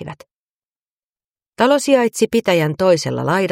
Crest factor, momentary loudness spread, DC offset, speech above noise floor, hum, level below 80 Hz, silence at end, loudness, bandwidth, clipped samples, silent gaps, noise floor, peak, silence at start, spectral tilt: 16 dB; 4 LU; under 0.1%; over 75 dB; none; -58 dBFS; 0 s; -16 LUFS; 16.5 kHz; under 0.1%; 0.31-1.10 s, 1.24-1.35 s, 1.48-1.52 s; under -90 dBFS; -2 dBFS; 0 s; -5 dB/octave